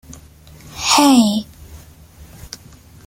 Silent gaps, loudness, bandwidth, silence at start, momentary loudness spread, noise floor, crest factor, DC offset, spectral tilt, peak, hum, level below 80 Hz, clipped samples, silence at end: none; -14 LUFS; 16.5 kHz; 0.7 s; 25 LU; -43 dBFS; 18 dB; under 0.1%; -3 dB/octave; 0 dBFS; none; -46 dBFS; under 0.1%; 0.6 s